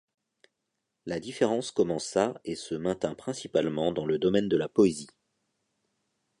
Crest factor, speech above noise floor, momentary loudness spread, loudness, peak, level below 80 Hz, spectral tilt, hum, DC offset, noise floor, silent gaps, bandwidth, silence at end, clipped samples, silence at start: 20 dB; 55 dB; 12 LU; -28 LUFS; -10 dBFS; -62 dBFS; -5.5 dB/octave; none; under 0.1%; -83 dBFS; none; 11.5 kHz; 1.35 s; under 0.1%; 1.05 s